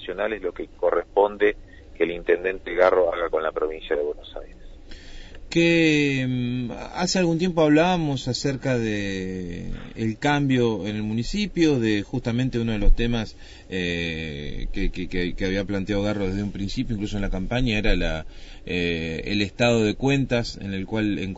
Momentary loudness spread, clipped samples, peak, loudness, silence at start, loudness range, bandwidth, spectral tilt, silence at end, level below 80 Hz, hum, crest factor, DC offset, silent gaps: 12 LU; under 0.1%; -6 dBFS; -24 LUFS; 0 s; 5 LU; 8 kHz; -6 dB/octave; 0 s; -32 dBFS; none; 18 dB; under 0.1%; none